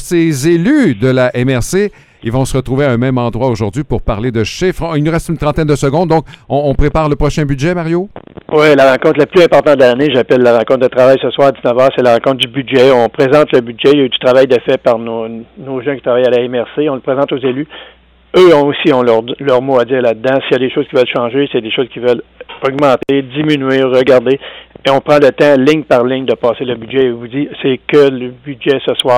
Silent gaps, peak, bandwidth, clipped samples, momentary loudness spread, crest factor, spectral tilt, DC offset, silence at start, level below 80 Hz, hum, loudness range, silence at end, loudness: none; 0 dBFS; 15.5 kHz; under 0.1%; 9 LU; 10 dB; -6 dB/octave; under 0.1%; 0 s; -32 dBFS; none; 5 LU; 0 s; -11 LUFS